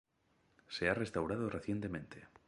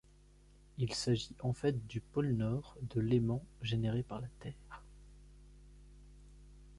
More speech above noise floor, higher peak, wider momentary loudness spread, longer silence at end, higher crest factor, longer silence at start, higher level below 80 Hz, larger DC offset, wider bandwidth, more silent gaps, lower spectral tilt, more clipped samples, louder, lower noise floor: first, 37 dB vs 26 dB; about the same, -18 dBFS vs -20 dBFS; second, 11 LU vs 16 LU; first, 0.2 s vs 0 s; about the same, 22 dB vs 18 dB; about the same, 0.7 s vs 0.75 s; about the same, -62 dBFS vs -58 dBFS; neither; about the same, 11.5 kHz vs 11.5 kHz; neither; about the same, -6 dB/octave vs -6.5 dB/octave; neither; about the same, -39 LUFS vs -37 LUFS; first, -75 dBFS vs -62 dBFS